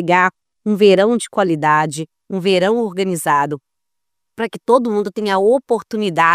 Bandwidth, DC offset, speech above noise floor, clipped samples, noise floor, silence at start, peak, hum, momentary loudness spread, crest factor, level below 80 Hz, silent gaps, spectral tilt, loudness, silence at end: 15.5 kHz; under 0.1%; 66 dB; under 0.1%; -82 dBFS; 0 s; 0 dBFS; none; 11 LU; 16 dB; -66 dBFS; none; -5 dB/octave; -16 LUFS; 0 s